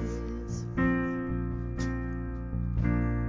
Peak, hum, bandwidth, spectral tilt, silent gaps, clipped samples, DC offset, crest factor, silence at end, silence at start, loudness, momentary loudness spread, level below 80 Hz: -16 dBFS; none; 7.6 kHz; -8 dB/octave; none; under 0.1%; under 0.1%; 14 dB; 0 s; 0 s; -32 LUFS; 8 LU; -36 dBFS